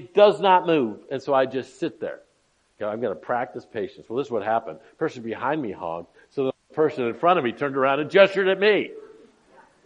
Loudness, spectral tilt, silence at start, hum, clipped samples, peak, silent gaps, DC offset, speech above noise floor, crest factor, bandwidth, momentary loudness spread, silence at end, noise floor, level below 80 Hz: -23 LUFS; -6 dB/octave; 0 s; none; under 0.1%; -2 dBFS; none; under 0.1%; 43 dB; 22 dB; 9.4 kHz; 15 LU; 0.75 s; -66 dBFS; -72 dBFS